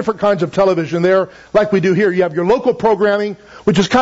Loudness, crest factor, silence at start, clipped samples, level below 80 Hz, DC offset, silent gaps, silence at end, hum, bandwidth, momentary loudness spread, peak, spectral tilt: -15 LUFS; 12 dB; 0 s; under 0.1%; -46 dBFS; under 0.1%; none; 0 s; none; 8 kHz; 3 LU; -2 dBFS; -6.5 dB/octave